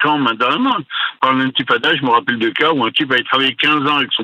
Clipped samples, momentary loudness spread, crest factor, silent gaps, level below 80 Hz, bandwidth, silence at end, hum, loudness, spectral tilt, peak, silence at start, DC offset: under 0.1%; 4 LU; 16 dB; none; -64 dBFS; 9.6 kHz; 0 s; none; -15 LUFS; -5.5 dB/octave; 0 dBFS; 0 s; under 0.1%